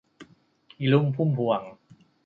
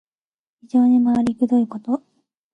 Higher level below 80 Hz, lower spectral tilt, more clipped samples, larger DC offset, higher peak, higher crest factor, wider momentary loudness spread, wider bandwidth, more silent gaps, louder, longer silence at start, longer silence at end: second, -70 dBFS vs -60 dBFS; first, -9.5 dB/octave vs -8 dB/octave; neither; neither; about the same, -8 dBFS vs -8 dBFS; first, 20 dB vs 12 dB; about the same, 8 LU vs 10 LU; about the same, 4.6 kHz vs 4.4 kHz; neither; second, -25 LUFS vs -19 LUFS; second, 0.2 s vs 0.75 s; about the same, 0.5 s vs 0.55 s